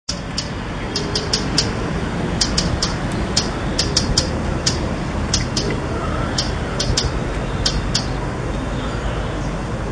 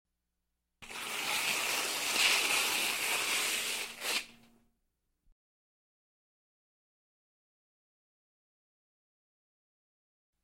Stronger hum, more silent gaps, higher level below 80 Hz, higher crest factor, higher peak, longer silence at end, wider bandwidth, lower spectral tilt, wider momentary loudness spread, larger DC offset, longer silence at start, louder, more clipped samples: neither; neither; first, -28 dBFS vs -76 dBFS; about the same, 20 dB vs 24 dB; first, 0 dBFS vs -14 dBFS; second, 0 s vs 6.1 s; second, 10 kHz vs 16.5 kHz; first, -4 dB/octave vs 1.5 dB/octave; second, 6 LU vs 10 LU; neither; second, 0.1 s vs 0.8 s; first, -21 LUFS vs -30 LUFS; neither